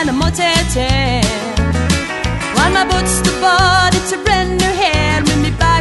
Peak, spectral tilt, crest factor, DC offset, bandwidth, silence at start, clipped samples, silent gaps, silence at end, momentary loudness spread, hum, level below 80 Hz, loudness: 0 dBFS; -4 dB/octave; 14 dB; under 0.1%; 12 kHz; 0 s; under 0.1%; none; 0 s; 5 LU; none; -24 dBFS; -13 LUFS